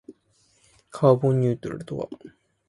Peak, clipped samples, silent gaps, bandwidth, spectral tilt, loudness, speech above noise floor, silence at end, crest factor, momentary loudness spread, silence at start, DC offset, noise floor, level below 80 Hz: -4 dBFS; under 0.1%; none; 11.5 kHz; -9 dB/octave; -23 LUFS; 41 dB; 0.4 s; 20 dB; 20 LU; 0.1 s; under 0.1%; -64 dBFS; -60 dBFS